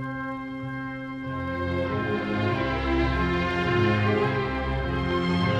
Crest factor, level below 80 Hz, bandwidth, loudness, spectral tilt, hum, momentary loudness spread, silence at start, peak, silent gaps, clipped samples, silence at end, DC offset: 14 dB; -38 dBFS; 9.4 kHz; -26 LUFS; -7.5 dB/octave; none; 10 LU; 0 s; -12 dBFS; none; under 0.1%; 0 s; under 0.1%